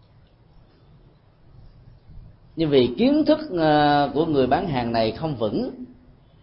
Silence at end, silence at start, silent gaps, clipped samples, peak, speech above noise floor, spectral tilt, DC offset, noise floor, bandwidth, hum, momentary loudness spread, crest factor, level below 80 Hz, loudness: 0.5 s; 1.6 s; none; under 0.1%; -6 dBFS; 33 dB; -11 dB/octave; under 0.1%; -54 dBFS; 5.6 kHz; none; 12 LU; 18 dB; -48 dBFS; -21 LUFS